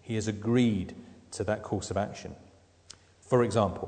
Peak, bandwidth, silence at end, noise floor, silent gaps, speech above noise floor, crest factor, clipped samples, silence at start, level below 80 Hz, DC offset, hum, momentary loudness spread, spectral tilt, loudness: -10 dBFS; 9.4 kHz; 0 s; -55 dBFS; none; 27 dB; 20 dB; under 0.1%; 0.05 s; -58 dBFS; under 0.1%; none; 18 LU; -6.5 dB/octave; -29 LUFS